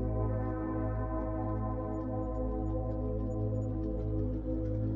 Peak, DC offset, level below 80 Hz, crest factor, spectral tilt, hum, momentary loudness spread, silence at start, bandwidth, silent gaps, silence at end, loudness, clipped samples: -22 dBFS; under 0.1%; -38 dBFS; 12 dB; -11.5 dB/octave; none; 2 LU; 0 s; 2.5 kHz; none; 0 s; -35 LUFS; under 0.1%